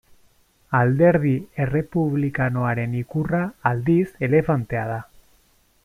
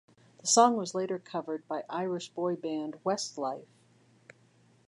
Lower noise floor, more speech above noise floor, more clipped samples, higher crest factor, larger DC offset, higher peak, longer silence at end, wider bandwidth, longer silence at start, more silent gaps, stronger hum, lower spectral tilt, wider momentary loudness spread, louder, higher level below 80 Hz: second, -60 dBFS vs -64 dBFS; first, 39 dB vs 33 dB; neither; second, 18 dB vs 24 dB; neither; first, -4 dBFS vs -8 dBFS; second, 0.8 s vs 1.25 s; first, 13 kHz vs 11.5 kHz; first, 0.7 s vs 0.45 s; neither; neither; first, -10 dB/octave vs -3 dB/octave; second, 9 LU vs 13 LU; first, -22 LUFS vs -31 LUFS; first, -48 dBFS vs -86 dBFS